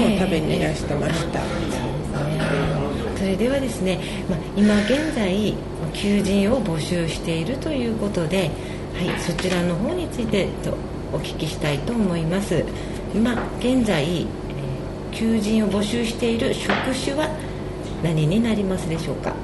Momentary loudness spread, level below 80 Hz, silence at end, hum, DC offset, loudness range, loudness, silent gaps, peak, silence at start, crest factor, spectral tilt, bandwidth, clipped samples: 8 LU; -36 dBFS; 0 s; none; under 0.1%; 3 LU; -23 LUFS; none; -6 dBFS; 0 s; 16 dB; -6 dB/octave; 12 kHz; under 0.1%